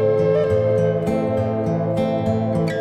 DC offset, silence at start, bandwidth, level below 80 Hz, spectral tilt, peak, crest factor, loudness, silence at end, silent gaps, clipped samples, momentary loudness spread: under 0.1%; 0 s; 10 kHz; -48 dBFS; -8.5 dB/octave; -8 dBFS; 10 dB; -20 LUFS; 0 s; none; under 0.1%; 4 LU